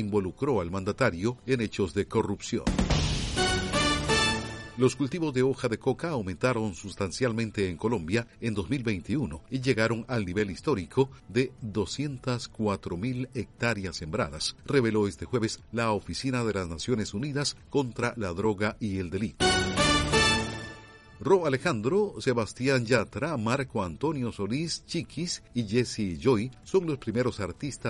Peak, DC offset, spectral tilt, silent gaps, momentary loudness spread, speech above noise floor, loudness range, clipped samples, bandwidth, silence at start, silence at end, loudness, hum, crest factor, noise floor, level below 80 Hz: -10 dBFS; under 0.1%; -5 dB/octave; none; 8 LU; 20 dB; 4 LU; under 0.1%; 11.5 kHz; 0 s; 0 s; -29 LUFS; none; 18 dB; -49 dBFS; -44 dBFS